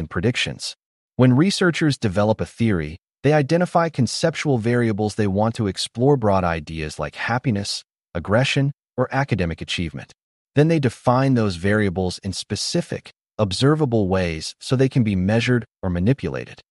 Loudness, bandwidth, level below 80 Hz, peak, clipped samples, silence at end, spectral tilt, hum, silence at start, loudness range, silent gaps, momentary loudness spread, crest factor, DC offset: -21 LUFS; 11.5 kHz; -46 dBFS; -4 dBFS; under 0.1%; 0.15 s; -6 dB/octave; none; 0 s; 3 LU; 0.86-1.09 s, 10.23-10.46 s; 11 LU; 16 dB; under 0.1%